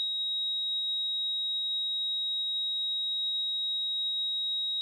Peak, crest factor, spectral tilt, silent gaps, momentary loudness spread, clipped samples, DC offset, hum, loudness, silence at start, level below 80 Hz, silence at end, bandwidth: -26 dBFS; 4 dB; 2.5 dB/octave; none; 0 LU; under 0.1%; under 0.1%; none; -28 LUFS; 0 s; under -90 dBFS; 0 s; 12.5 kHz